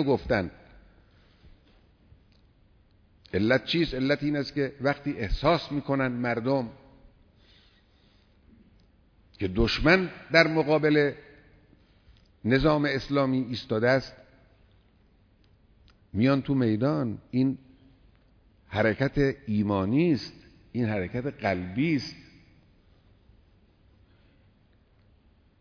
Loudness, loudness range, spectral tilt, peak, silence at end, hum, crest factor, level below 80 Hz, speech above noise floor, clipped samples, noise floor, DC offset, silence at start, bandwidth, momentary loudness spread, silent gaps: -26 LUFS; 9 LU; -7 dB/octave; -6 dBFS; 3.4 s; none; 22 dB; -46 dBFS; 36 dB; under 0.1%; -62 dBFS; under 0.1%; 0 s; 5.4 kHz; 10 LU; none